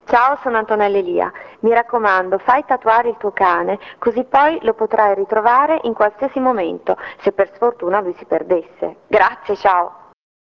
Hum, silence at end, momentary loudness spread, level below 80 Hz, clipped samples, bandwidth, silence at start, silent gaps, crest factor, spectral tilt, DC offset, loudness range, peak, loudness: none; 0.65 s; 7 LU; -56 dBFS; under 0.1%; 6.6 kHz; 0.1 s; none; 16 dB; -6.5 dB/octave; under 0.1%; 3 LU; 0 dBFS; -17 LUFS